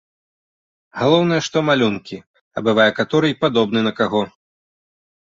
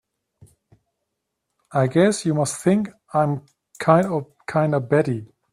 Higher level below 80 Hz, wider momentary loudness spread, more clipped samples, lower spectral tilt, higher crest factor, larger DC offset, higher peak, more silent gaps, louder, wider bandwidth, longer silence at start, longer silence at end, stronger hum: about the same, -58 dBFS vs -62 dBFS; first, 15 LU vs 9 LU; neither; about the same, -5.5 dB/octave vs -6.5 dB/octave; about the same, 18 dB vs 20 dB; neither; about the same, -2 dBFS vs -2 dBFS; first, 2.27-2.34 s, 2.41-2.51 s vs none; first, -17 LUFS vs -21 LUFS; second, 7.6 kHz vs 13.5 kHz; second, 0.95 s vs 1.7 s; first, 1 s vs 0.3 s; neither